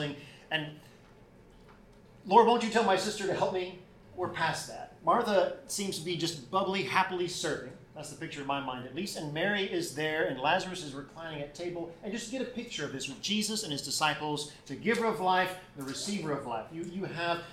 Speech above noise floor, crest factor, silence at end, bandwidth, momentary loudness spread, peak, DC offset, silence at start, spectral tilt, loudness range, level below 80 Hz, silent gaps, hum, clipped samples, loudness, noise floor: 25 dB; 24 dB; 0 s; 16 kHz; 13 LU; -8 dBFS; under 0.1%; 0 s; -3.5 dB/octave; 5 LU; -64 dBFS; none; none; under 0.1%; -32 LUFS; -56 dBFS